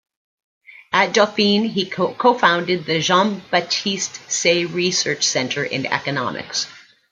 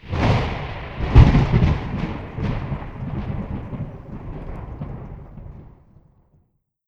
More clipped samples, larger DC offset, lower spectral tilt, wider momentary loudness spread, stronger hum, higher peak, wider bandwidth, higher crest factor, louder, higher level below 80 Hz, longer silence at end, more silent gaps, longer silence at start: neither; neither; second, -3 dB/octave vs -8.5 dB/octave; second, 7 LU vs 22 LU; neither; about the same, -2 dBFS vs 0 dBFS; first, 9.6 kHz vs 7.2 kHz; about the same, 18 dB vs 22 dB; about the same, -19 LUFS vs -21 LUFS; second, -64 dBFS vs -26 dBFS; second, 0.3 s vs 1.2 s; neither; first, 0.7 s vs 0.05 s